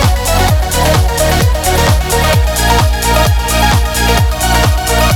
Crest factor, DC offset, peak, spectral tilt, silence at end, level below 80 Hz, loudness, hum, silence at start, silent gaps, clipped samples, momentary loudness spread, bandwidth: 10 dB; under 0.1%; 0 dBFS; -4 dB/octave; 0 s; -14 dBFS; -11 LUFS; none; 0 s; none; under 0.1%; 1 LU; 19 kHz